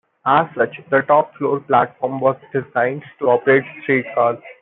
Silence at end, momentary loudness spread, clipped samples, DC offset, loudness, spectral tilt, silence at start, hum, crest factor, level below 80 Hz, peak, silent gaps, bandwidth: 0.1 s; 7 LU; under 0.1%; under 0.1%; -18 LUFS; -11 dB/octave; 0.25 s; none; 16 dB; -64 dBFS; -2 dBFS; none; 4.1 kHz